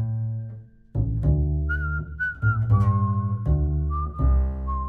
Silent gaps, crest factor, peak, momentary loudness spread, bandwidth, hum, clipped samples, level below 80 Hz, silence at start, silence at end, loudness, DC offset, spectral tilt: none; 14 dB; -10 dBFS; 9 LU; 3.1 kHz; none; under 0.1%; -28 dBFS; 0 s; 0 s; -25 LUFS; under 0.1%; -10.5 dB/octave